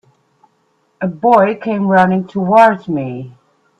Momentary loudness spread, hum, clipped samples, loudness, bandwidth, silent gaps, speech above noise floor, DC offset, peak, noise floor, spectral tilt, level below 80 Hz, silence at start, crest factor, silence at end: 15 LU; none; under 0.1%; -13 LUFS; 8.4 kHz; none; 47 dB; under 0.1%; 0 dBFS; -60 dBFS; -8 dB/octave; -58 dBFS; 1 s; 14 dB; 0.5 s